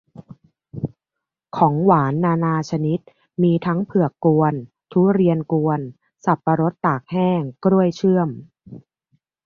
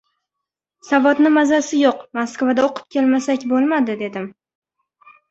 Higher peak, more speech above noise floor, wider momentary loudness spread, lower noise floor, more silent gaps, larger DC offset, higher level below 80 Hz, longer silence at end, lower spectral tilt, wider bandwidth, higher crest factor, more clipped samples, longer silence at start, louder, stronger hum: about the same, -2 dBFS vs -2 dBFS; about the same, 66 dB vs 66 dB; first, 14 LU vs 11 LU; about the same, -84 dBFS vs -83 dBFS; neither; neither; first, -58 dBFS vs -64 dBFS; second, 0.65 s vs 1 s; first, -9 dB/octave vs -4 dB/octave; second, 7 kHz vs 8 kHz; about the same, 18 dB vs 16 dB; neither; second, 0.2 s vs 0.85 s; about the same, -19 LUFS vs -17 LUFS; neither